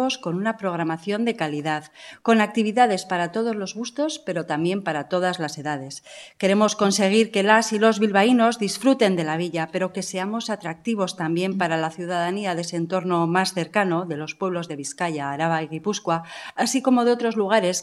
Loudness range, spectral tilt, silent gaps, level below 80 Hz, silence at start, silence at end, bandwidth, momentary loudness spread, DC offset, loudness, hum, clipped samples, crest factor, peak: 6 LU; -4.5 dB/octave; none; -72 dBFS; 0 s; 0 s; 13 kHz; 10 LU; under 0.1%; -23 LUFS; none; under 0.1%; 22 dB; -2 dBFS